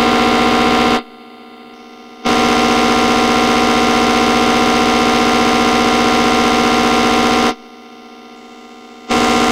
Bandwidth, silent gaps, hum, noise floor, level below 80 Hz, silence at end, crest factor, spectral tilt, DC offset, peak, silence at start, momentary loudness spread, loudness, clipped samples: 16 kHz; none; none; -37 dBFS; -36 dBFS; 0 s; 14 dB; -3.5 dB/octave; under 0.1%; 0 dBFS; 0 s; 3 LU; -12 LUFS; under 0.1%